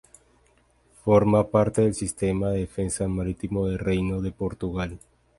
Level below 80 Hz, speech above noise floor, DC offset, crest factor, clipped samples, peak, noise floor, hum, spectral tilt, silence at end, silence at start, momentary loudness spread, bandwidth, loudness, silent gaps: -42 dBFS; 38 dB; under 0.1%; 20 dB; under 0.1%; -6 dBFS; -62 dBFS; none; -7 dB/octave; 0.4 s; 1.05 s; 10 LU; 11.5 kHz; -25 LUFS; none